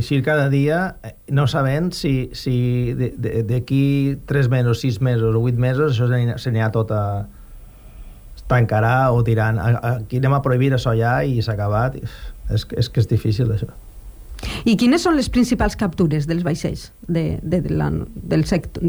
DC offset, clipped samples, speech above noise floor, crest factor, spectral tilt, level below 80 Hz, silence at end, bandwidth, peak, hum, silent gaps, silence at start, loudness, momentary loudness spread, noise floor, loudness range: under 0.1%; under 0.1%; 21 dB; 14 dB; -7 dB/octave; -36 dBFS; 0 s; over 20 kHz; -6 dBFS; none; none; 0 s; -19 LUFS; 8 LU; -40 dBFS; 3 LU